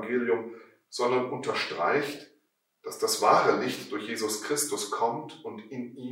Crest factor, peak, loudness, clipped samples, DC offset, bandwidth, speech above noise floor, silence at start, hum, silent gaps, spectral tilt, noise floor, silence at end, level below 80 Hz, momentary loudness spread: 22 dB; -6 dBFS; -28 LUFS; under 0.1%; under 0.1%; 16 kHz; 44 dB; 0 s; none; none; -3 dB/octave; -72 dBFS; 0 s; -82 dBFS; 18 LU